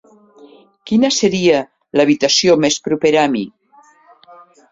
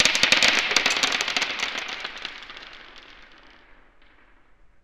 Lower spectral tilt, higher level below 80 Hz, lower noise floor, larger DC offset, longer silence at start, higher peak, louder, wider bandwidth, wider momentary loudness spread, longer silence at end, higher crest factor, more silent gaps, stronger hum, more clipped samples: first, -3.5 dB/octave vs 0.5 dB/octave; about the same, -56 dBFS vs -56 dBFS; second, -50 dBFS vs -54 dBFS; neither; first, 0.85 s vs 0 s; about the same, -2 dBFS vs 0 dBFS; first, -14 LUFS vs -21 LUFS; second, 7.8 kHz vs 15 kHz; second, 7 LU vs 23 LU; second, 1.2 s vs 1.35 s; second, 16 dB vs 26 dB; neither; neither; neither